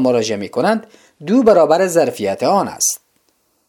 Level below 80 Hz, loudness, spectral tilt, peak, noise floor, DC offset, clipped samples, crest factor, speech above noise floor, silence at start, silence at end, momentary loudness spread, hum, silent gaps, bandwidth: -58 dBFS; -15 LUFS; -4 dB/octave; 0 dBFS; -62 dBFS; under 0.1%; under 0.1%; 16 dB; 47 dB; 0 s; 0.7 s; 9 LU; none; none; 19 kHz